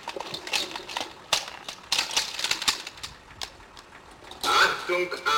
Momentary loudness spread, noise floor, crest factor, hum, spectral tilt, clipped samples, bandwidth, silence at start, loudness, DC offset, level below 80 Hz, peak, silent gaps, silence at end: 19 LU; -48 dBFS; 20 dB; none; -0.5 dB/octave; under 0.1%; 17 kHz; 0 s; -26 LUFS; under 0.1%; -58 dBFS; -8 dBFS; none; 0 s